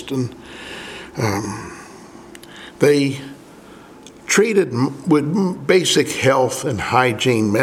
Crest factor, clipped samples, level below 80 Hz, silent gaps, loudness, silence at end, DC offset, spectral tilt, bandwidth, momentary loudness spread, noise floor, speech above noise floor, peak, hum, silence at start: 18 dB; under 0.1%; -54 dBFS; none; -18 LUFS; 0 s; under 0.1%; -4.5 dB/octave; 16.5 kHz; 22 LU; -41 dBFS; 24 dB; 0 dBFS; none; 0 s